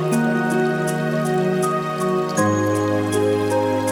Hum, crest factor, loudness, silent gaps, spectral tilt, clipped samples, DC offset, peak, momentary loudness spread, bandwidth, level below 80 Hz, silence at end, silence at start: none; 14 dB; -20 LUFS; none; -6 dB/octave; under 0.1%; under 0.1%; -4 dBFS; 2 LU; 19.5 kHz; -56 dBFS; 0 s; 0 s